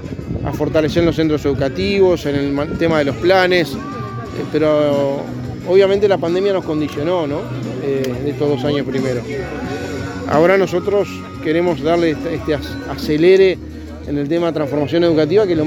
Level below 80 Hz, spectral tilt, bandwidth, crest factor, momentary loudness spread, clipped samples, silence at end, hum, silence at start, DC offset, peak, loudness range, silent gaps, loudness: -40 dBFS; -6.5 dB/octave; 17 kHz; 16 dB; 12 LU; under 0.1%; 0 s; none; 0 s; under 0.1%; 0 dBFS; 3 LU; none; -17 LUFS